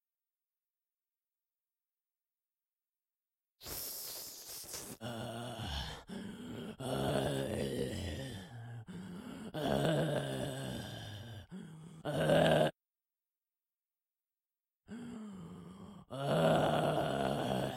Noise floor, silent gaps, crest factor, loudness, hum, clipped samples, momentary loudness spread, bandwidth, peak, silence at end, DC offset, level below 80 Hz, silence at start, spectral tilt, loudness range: under -90 dBFS; none; 22 dB; -36 LUFS; none; under 0.1%; 19 LU; 16.5 kHz; -16 dBFS; 0 s; under 0.1%; -60 dBFS; 3.6 s; -5.5 dB/octave; 12 LU